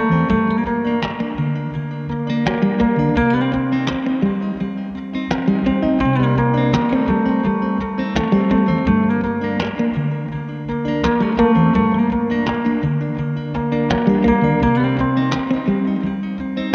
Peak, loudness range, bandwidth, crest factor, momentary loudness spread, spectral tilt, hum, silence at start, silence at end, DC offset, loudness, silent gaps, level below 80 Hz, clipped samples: -2 dBFS; 2 LU; 6.8 kHz; 16 dB; 8 LU; -8 dB/octave; none; 0 s; 0 s; under 0.1%; -18 LUFS; none; -36 dBFS; under 0.1%